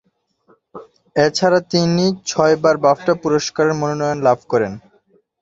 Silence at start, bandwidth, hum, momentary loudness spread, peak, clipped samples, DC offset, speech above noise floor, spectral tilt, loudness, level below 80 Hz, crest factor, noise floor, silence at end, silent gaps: 0.75 s; 7.8 kHz; none; 6 LU; 0 dBFS; under 0.1%; under 0.1%; 42 dB; -5 dB/octave; -17 LUFS; -56 dBFS; 18 dB; -58 dBFS; 0.6 s; none